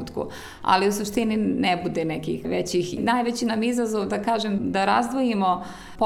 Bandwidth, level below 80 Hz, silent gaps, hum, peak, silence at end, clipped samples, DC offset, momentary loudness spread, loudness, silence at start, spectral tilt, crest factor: 16 kHz; -52 dBFS; none; none; -6 dBFS; 0 s; under 0.1%; under 0.1%; 8 LU; -24 LUFS; 0 s; -5 dB/octave; 18 dB